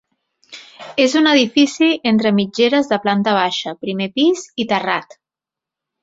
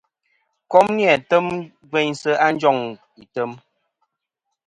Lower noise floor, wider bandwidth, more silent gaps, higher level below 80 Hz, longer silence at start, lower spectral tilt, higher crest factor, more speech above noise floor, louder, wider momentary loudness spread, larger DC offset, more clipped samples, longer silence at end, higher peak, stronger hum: first, -87 dBFS vs -79 dBFS; second, 8 kHz vs 11 kHz; neither; about the same, -62 dBFS vs -66 dBFS; second, 0.5 s vs 0.7 s; about the same, -4.5 dB/octave vs -5 dB/octave; about the same, 16 dB vs 20 dB; first, 71 dB vs 61 dB; first, -16 LUFS vs -19 LUFS; second, 10 LU vs 13 LU; neither; neither; about the same, 1 s vs 1.1 s; about the same, -2 dBFS vs 0 dBFS; neither